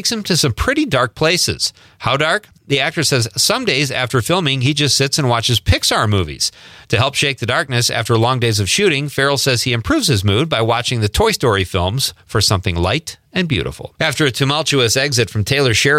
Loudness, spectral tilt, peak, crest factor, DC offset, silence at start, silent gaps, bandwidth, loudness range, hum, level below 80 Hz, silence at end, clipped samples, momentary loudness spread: -15 LUFS; -3.5 dB/octave; -2 dBFS; 14 dB; under 0.1%; 0 s; none; 16.5 kHz; 2 LU; none; -38 dBFS; 0 s; under 0.1%; 6 LU